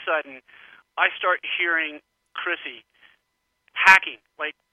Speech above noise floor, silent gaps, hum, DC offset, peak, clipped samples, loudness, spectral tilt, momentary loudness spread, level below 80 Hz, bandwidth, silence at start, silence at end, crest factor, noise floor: 52 dB; none; none; under 0.1%; 0 dBFS; under 0.1%; -21 LUFS; -1 dB/octave; 22 LU; -70 dBFS; 16.5 kHz; 0 s; 0.2 s; 24 dB; -75 dBFS